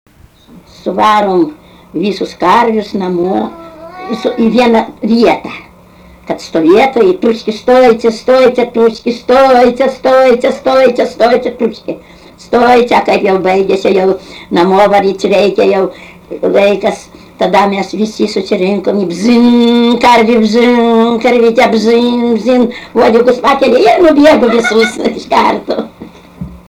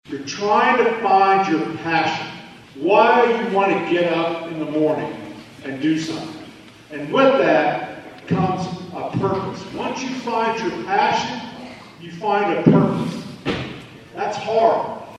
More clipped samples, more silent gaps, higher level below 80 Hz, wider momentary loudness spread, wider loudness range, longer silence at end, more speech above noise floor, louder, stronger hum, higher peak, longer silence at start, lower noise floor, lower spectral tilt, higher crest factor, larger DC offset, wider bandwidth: first, 0.1% vs under 0.1%; neither; first, -44 dBFS vs -56 dBFS; second, 11 LU vs 19 LU; about the same, 5 LU vs 5 LU; about the same, 0.1 s vs 0 s; first, 29 dB vs 23 dB; first, -9 LUFS vs -19 LUFS; neither; about the same, 0 dBFS vs 0 dBFS; first, 0.85 s vs 0.05 s; about the same, -38 dBFS vs -41 dBFS; about the same, -5.5 dB/octave vs -6 dB/octave; second, 10 dB vs 20 dB; neither; first, 14.5 kHz vs 12 kHz